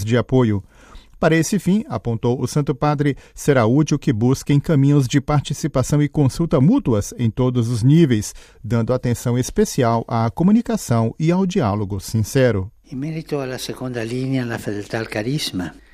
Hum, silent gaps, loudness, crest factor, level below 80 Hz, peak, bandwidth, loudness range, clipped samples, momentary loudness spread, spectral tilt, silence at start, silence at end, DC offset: none; none; -19 LUFS; 18 dB; -42 dBFS; -2 dBFS; 15.5 kHz; 5 LU; under 0.1%; 10 LU; -6.5 dB/octave; 0 s; 0.2 s; under 0.1%